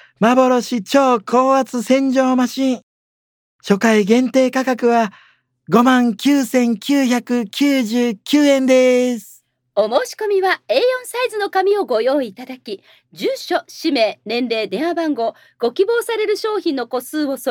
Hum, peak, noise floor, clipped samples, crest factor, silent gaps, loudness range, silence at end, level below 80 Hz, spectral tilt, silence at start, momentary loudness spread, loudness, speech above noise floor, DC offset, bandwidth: none; 0 dBFS; under -90 dBFS; under 0.1%; 16 dB; 2.83-3.59 s; 4 LU; 0 s; -70 dBFS; -4.5 dB/octave; 0.2 s; 10 LU; -17 LUFS; over 74 dB; under 0.1%; 19 kHz